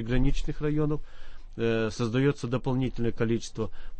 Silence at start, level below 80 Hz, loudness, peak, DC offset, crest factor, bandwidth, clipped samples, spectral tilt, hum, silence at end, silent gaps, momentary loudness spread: 0 s; -34 dBFS; -29 LUFS; -12 dBFS; under 0.1%; 16 dB; 8.6 kHz; under 0.1%; -7 dB/octave; none; 0 s; none; 8 LU